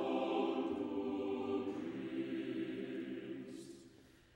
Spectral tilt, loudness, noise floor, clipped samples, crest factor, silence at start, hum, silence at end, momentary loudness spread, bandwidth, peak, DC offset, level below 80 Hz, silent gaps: -6.5 dB/octave; -41 LUFS; -63 dBFS; under 0.1%; 16 dB; 0 s; none; 0.25 s; 12 LU; 16 kHz; -24 dBFS; under 0.1%; -76 dBFS; none